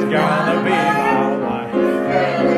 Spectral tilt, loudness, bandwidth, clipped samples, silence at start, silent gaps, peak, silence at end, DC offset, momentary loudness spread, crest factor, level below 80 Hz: -6.5 dB/octave; -17 LUFS; 13.5 kHz; under 0.1%; 0 s; none; -2 dBFS; 0 s; under 0.1%; 3 LU; 14 dB; -52 dBFS